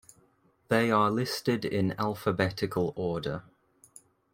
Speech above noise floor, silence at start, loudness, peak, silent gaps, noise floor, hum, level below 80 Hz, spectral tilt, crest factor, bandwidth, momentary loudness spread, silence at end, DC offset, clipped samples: 38 dB; 0.7 s; -29 LUFS; -10 dBFS; none; -67 dBFS; none; -62 dBFS; -6 dB/octave; 20 dB; 16.5 kHz; 8 LU; 0.95 s; under 0.1%; under 0.1%